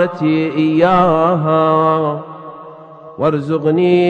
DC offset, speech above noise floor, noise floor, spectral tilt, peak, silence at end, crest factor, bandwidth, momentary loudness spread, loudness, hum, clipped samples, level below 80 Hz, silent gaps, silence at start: under 0.1%; 22 dB; -36 dBFS; -9 dB/octave; 0 dBFS; 0 s; 14 dB; 7 kHz; 20 LU; -14 LUFS; none; under 0.1%; -50 dBFS; none; 0 s